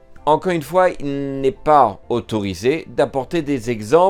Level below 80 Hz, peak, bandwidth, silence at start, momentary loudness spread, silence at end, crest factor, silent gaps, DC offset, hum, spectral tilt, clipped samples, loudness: -44 dBFS; 0 dBFS; 17.5 kHz; 0.1 s; 9 LU; 0 s; 18 dB; none; under 0.1%; none; -6 dB/octave; under 0.1%; -19 LUFS